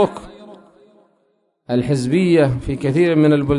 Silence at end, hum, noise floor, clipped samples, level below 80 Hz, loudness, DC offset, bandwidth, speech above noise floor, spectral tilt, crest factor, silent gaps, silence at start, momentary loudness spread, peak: 0 s; none; -64 dBFS; under 0.1%; -42 dBFS; -17 LUFS; under 0.1%; 11 kHz; 49 dB; -7.5 dB/octave; 14 dB; none; 0 s; 8 LU; -2 dBFS